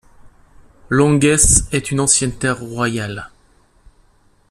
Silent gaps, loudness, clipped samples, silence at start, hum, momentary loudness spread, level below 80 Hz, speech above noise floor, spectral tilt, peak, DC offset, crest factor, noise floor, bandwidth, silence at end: none; -15 LUFS; under 0.1%; 0.25 s; none; 12 LU; -32 dBFS; 39 dB; -4 dB/octave; 0 dBFS; under 0.1%; 18 dB; -54 dBFS; 13.5 kHz; 1.25 s